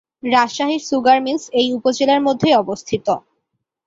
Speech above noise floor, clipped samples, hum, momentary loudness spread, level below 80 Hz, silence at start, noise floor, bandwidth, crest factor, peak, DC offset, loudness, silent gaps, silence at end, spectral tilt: 57 dB; under 0.1%; none; 7 LU; -58 dBFS; 0.25 s; -74 dBFS; 7.8 kHz; 16 dB; -2 dBFS; under 0.1%; -17 LUFS; none; 0.7 s; -4 dB/octave